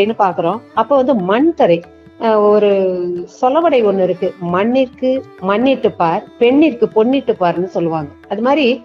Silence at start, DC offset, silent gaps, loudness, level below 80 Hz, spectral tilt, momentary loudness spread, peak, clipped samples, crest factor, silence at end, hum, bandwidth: 0 s; under 0.1%; none; -14 LUFS; -56 dBFS; -7.5 dB/octave; 8 LU; 0 dBFS; under 0.1%; 14 dB; 0 s; none; 7 kHz